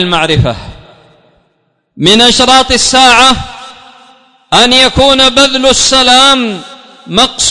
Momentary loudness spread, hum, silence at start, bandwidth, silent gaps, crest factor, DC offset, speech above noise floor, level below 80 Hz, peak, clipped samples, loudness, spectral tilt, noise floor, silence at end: 12 LU; none; 0 s; 12 kHz; none; 8 dB; under 0.1%; 51 dB; -30 dBFS; 0 dBFS; 2%; -5 LUFS; -2.5 dB/octave; -58 dBFS; 0 s